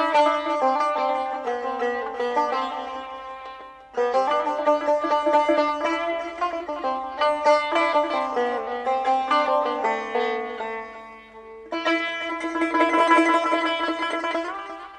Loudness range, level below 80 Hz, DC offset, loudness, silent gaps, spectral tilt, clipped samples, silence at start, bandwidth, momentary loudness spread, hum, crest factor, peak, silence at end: 4 LU; -62 dBFS; under 0.1%; -23 LUFS; none; -3 dB/octave; under 0.1%; 0 s; 9.8 kHz; 14 LU; none; 18 dB; -6 dBFS; 0 s